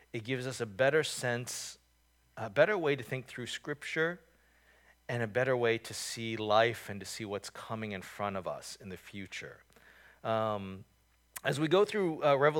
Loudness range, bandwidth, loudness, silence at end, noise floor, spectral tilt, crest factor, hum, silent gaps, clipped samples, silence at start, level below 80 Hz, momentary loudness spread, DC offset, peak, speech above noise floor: 7 LU; 19 kHz; -33 LUFS; 0 s; -70 dBFS; -4.5 dB/octave; 24 dB; none; none; under 0.1%; 0.15 s; -72 dBFS; 17 LU; under 0.1%; -10 dBFS; 37 dB